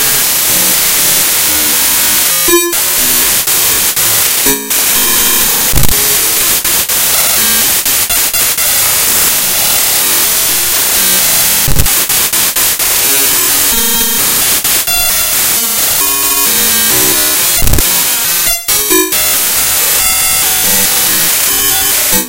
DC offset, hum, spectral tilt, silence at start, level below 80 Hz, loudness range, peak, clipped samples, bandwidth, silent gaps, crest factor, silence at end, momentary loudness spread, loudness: under 0.1%; none; -0.5 dB/octave; 0 s; -28 dBFS; 1 LU; 0 dBFS; 0.3%; over 20 kHz; none; 10 dB; 0 s; 2 LU; -7 LUFS